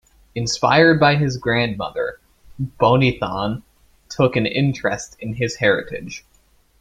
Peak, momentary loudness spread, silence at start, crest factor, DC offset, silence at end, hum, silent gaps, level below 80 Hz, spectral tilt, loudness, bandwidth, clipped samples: -2 dBFS; 17 LU; 0.35 s; 18 dB; under 0.1%; 0.6 s; none; none; -48 dBFS; -5.5 dB/octave; -19 LUFS; 10 kHz; under 0.1%